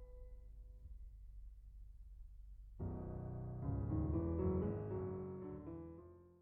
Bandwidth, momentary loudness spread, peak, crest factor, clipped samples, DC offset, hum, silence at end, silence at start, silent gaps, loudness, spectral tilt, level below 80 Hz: 2.9 kHz; 21 LU; -28 dBFS; 18 dB; under 0.1%; under 0.1%; none; 0 s; 0 s; none; -44 LUFS; -10.5 dB/octave; -52 dBFS